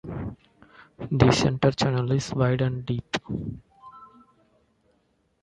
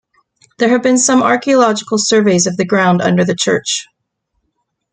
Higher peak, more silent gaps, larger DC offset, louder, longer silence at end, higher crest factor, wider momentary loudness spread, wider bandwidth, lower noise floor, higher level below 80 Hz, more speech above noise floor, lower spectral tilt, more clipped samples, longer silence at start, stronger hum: about the same, -2 dBFS vs -2 dBFS; neither; neither; second, -25 LUFS vs -12 LUFS; first, 1.4 s vs 1.1 s; first, 24 dB vs 12 dB; first, 17 LU vs 5 LU; first, 11 kHz vs 9.6 kHz; about the same, -69 dBFS vs -69 dBFS; first, -48 dBFS vs -58 dBFS; second, 45 dB vs 57 dB; first, -6 dB/octave vs -4 dB/octave; neither; second, 0.05 s vs 0.6 s; neither